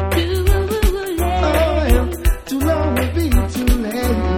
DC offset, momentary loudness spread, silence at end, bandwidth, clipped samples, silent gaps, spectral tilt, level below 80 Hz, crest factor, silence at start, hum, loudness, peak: under 0.1%; 4 LU; 0 s; 17.5 kHz; under 0.1%; none; -6 dB/octave; -20 dBFS; 16 dB; 0 s; none; -18 LUFS; -2 dBFS